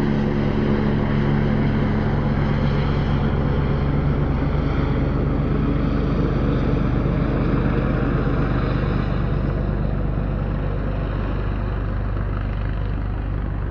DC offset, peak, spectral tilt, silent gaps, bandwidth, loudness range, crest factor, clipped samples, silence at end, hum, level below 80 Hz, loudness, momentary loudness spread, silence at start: under 0.1%; -8 dBFS; -9.5 dB/octave; none; 6 kHz; 4 LU; 12 dB; under 0.1%; 0 s; none; -26 dBFS; -22 LUFS; 5 LU; 0 s